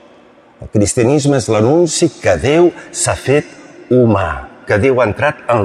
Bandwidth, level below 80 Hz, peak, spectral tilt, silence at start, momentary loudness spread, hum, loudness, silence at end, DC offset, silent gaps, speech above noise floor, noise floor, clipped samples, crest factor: 13 kHz; -38 dBFS; -2 dBFS; -5.5 dB/octave; 0.6 s; 6 LU; none; -13 LUFS; 0 s; under 0.1%; none; 32 dB; -44 dBFS; under 0.1%; 12 dB